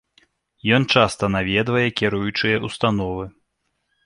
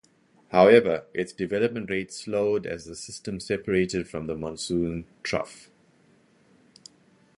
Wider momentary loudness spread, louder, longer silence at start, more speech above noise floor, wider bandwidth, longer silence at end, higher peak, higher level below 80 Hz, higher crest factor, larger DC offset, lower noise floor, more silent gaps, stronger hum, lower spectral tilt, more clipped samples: second, 11 LU vs 16 LU; first, -20 LUFS vs -26 LUFS; first, 0.65 s vs 0.5 s; first, 52 dB vs 36 dB; about the same, 11.5 kHz vs 11.5 kHz; second, 0.75 s vs 1.8 s; about the same, -2 dBFS vs -2 dBFS; first, -46 dBFS vs -54 dBFS; about the same, 20 dB vs 24 dB; neither; first, -72 dBFS vs -61 dBFS; neither; neither; about the same, -5.5 dB/octave vs -5.5 dB/octave; neither